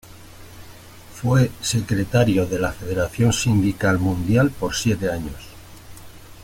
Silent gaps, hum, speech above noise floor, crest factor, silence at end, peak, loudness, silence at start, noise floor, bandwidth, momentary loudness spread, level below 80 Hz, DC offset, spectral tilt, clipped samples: none; none; 22 dB; 18 dB; 0 s; -4 dBFS; -21 LUFS; 0.1 s; -42 dBFS; 17 kHz; 10 LU; -42 dBFS; under 0.1%; -5.5 dB/octave; under 0.1%